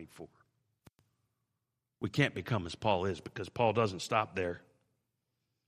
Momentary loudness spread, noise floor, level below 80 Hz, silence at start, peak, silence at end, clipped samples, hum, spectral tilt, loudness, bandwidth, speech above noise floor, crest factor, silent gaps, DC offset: 17 LU; -86 dBFS; -70 dBFS; 0 s; -12 dBFS; 1.1 s; under 0.1%; none; -5.5 dB/octave; -34 LUFS; 15 kHz; 52 dB; 24 dB; none; under 0.1%